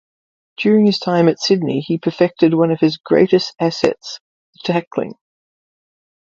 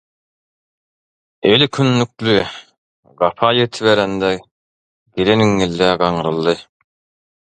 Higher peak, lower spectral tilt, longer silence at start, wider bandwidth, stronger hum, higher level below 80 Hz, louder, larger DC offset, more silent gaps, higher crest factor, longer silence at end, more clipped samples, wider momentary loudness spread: about the same, 0 dBFS vs 0 dBFS; about the same, -6.5 dB/octave vs -5.5 dB/octave; second, 0.6 s vs 1.45 s; second, 7.6 kHz vs 9.4 kHz; neither; second, -60 dBFS vs -48 dBFS; about the same, -16 LUFS vs -16 LUFS; neither; second, 3.00-3.04 s, 4.21-4.53 s, 4.87-4.91 s vs 2.78-3.03 s, 4.51-5.06 s; about the same, 18 dB vs 18 dB; first, 1.15 s vs 0.85 s; neither; first, 12 LU vs 8 LU